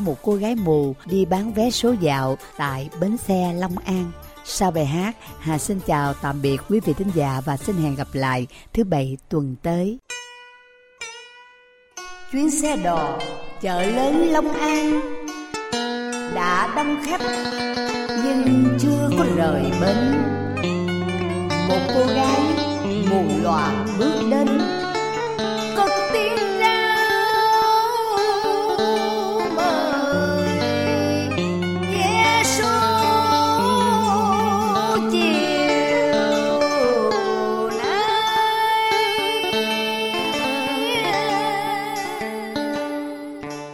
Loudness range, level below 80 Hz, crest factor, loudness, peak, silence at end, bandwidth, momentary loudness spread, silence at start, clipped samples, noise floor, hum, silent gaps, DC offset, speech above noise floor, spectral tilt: 6 LU; -46 dBFS; 16 dB; -20 LUFS; -6 dBFS; 0 s; 16.5 kHz; 9 LU; 0 s; under 0.1%; -52 dBFS; none; none; under 0.1%; 32 dB; -5 dB/octave